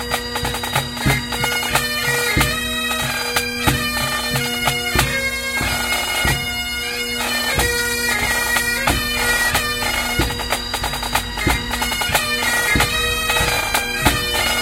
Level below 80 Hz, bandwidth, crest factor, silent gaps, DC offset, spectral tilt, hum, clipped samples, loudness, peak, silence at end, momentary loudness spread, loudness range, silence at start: -32 dBFS; 17 kHz; 20 dB; none; under 0.1%; -2.5 dB/octave; none; under 0.1%; -18 LUFS; 0 dBFS; 0 s; 5 LU; 1 LU; 0 s